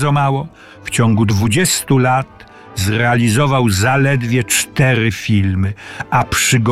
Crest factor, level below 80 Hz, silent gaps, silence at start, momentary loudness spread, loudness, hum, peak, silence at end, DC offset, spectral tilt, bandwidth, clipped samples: 14 dB; -42 dBFS; none; 0 s; 9 LU; -14 LUFS; none; 0 dBFS; 0 s; under 0.1%; -4.5 dB/octave; 15.5 kHz; under 0.1%